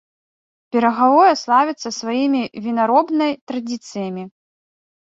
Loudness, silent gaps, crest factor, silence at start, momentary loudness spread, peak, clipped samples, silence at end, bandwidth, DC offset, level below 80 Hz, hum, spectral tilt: -18 LUFS; 3.41-3.47 s; 16 dB; 0.75 s; 14 LU; -2 dBFS; under 0.1%; 0.85 s; 7.8 kHz; under 0.1%; -68 dBFS; none; -4.5 dB/octave